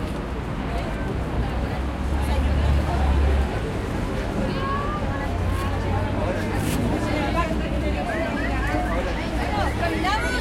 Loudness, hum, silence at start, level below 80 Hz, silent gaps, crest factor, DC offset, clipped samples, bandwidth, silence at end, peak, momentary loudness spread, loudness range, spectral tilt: -25 LUFS; none; 0 s; -28 dBFS; none; 14 dB; under 0.1%; under 0.1%; 15 kHz; 0 s; -10 dBFS; 5 LU; 1 LU; -6.5 dB/octave